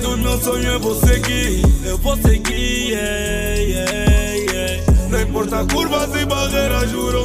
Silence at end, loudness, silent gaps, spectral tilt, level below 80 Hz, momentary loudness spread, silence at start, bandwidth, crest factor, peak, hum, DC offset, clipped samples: 0 s; -18 LUFS; none; -4.5 dB/octave; -20 dBFS; 4 LU; 0 s; 16 kHz; 14 dB; -2 dBFS; none; 0.3%; under 0.1%